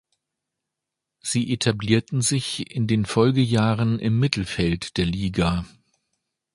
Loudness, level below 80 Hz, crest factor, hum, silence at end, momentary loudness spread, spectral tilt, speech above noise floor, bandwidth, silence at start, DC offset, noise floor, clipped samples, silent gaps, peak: -22 LUFS; -44 dBFS; 22 dB; none; 0.85 s; 7 LU; -5.5 dB/octave; 63 dB; 11.5 kHz; 1.25 s; under 0.1%; -84 dBFS; under 0.1%; none; -2 dBFS